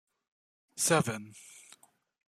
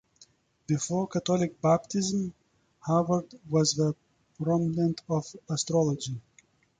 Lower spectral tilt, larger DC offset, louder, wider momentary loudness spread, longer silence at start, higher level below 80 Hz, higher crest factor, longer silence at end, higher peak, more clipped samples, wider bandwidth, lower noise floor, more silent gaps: second, -3.5 dB/octave vs -5.5 dB/octave; neither; about the same, -30 LUFS vs -28 LUFS; first, 24 LU vs 9 LU; about the same, 0.75 s vs 0.7 s; second, -74 dBFS vs -64 dBFS; first, 24 dB vs 18 dB; first, 0.85 s vs 0.6 s; about the same, -12 dBFS vs -12 dBFS; neither; first, 15 kHz vs 9.4 kHz; about the same, -61 dBFS vs -64 dBFS; neither